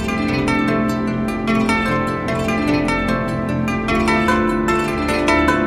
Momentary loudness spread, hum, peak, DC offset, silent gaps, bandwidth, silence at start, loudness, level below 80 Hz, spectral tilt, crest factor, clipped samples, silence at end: 5 LU; none; -2 dBFS; under 0.1%; none; 14.5 kHz; 0 s; -18 LUFS; -34 dBFS; -6 dB/octave; 16 dB; under 0.1%; 0 s